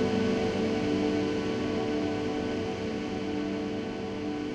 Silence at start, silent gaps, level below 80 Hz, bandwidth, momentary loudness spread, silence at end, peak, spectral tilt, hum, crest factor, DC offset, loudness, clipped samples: 0 s; none; -52 dBFS; 9.8 kHz; 6 LU; 0 s; -16 dBFS; -6 dB/octave; none; 14 dB; under 0.1%; -30 LUFS; under 0.1%